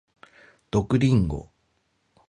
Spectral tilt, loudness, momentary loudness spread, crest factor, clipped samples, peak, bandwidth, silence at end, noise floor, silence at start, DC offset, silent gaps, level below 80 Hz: -8 dB/octave; -24 LUFS; 10 LU; 16 dB; under 0.1%; -10 dBFS; 10 kHz; 0.85 s; -70 dBFS; 0.75 s; under 0.1%; none; -42 dBFS